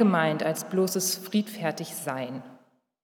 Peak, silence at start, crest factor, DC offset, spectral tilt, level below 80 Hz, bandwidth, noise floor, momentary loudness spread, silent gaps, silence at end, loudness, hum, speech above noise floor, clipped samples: -10 dBFS; 0 s; 18 dB; under 0.1%; -4.5 dB/octave; -88 dBFS; 19.5 kHz; -59 dBFS; 9 LU; none; 0.5 s; -28 LUFS; none; 32 dB; under 0.1%